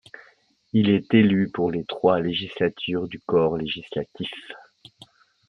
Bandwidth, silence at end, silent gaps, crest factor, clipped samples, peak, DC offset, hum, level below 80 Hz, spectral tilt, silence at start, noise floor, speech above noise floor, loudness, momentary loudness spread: 5.8 kHz; 0.9 s; none; 20 dB; under 0.1%; -4 dBFS; under 0.1%; none; -60 dBFS; -8.5 dB/octave; 0.15 s; -59 dBFS; 37 dB; -23 LUFS; 14 LU